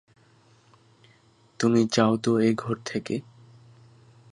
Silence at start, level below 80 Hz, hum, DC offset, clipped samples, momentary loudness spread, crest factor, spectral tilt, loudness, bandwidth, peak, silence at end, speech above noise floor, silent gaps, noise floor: 1.6 s; -66 dBFS; none; under 0.1%; under 0.1%; 10 LU; 22 dB; -5.5 dB/octave; -25 LUFS; 11 kHz; -6 dBFS; 1.15 s; 36 dB; none; -59 dBFS